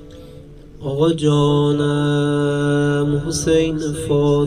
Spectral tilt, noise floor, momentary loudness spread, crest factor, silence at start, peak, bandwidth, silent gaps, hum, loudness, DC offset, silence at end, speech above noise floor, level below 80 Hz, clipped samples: -6 dB/octave; -39 dBFS; 5 LU; 14 dB; 0 s; -4 dBFS; 13.5 kHz; none; none; -18 LUFS; 0.3%; 0 s; 22 dB; -40 dBFS; under 0.1%